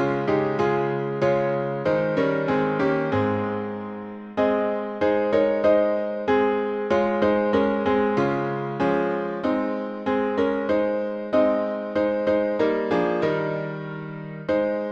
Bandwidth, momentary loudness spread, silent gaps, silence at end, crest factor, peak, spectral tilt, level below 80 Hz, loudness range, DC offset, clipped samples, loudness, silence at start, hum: 7.2 kHz; 7 LU; none; 0 s; 16 dB; -8 dBFS; -8 dB/octave; -56 dBFS; 2 LU; under 0.1%; under 0.1%; -23 LUFS; 0 s; none